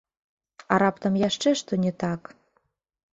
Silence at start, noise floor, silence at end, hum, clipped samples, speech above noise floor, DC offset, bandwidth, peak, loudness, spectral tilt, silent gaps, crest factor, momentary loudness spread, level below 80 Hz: 0.7 s; -72 dBFS; 0.95 s; none; under 0.1%; 48 dB; under 0.1%; 8 kHz; -4 dBFS; -25 LUFS; -5.5 dB/octave; none; 22 dB; 8 LU; -62 dBFS